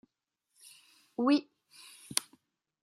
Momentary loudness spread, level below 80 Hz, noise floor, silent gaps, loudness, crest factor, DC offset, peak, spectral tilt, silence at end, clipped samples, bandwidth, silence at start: 26 LU; -84 dBFS; -85 dBFS; none; -32 LUFS; 32 dB; under 0.1%; -4 dBFS; -2.5 dB/octave; 0.6 s; under 0.1%; 14 kHz; 1.2 s